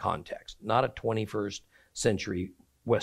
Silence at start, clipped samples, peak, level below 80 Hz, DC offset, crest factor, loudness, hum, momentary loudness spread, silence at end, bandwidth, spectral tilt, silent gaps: 0 s; under 0.1%; -10 dBFS; -58 dBFS; under 0.1%; 20 dB; -31 LUFS; none; 15 LU; 0 s; 14.5 kHz; -5 dB/octave; none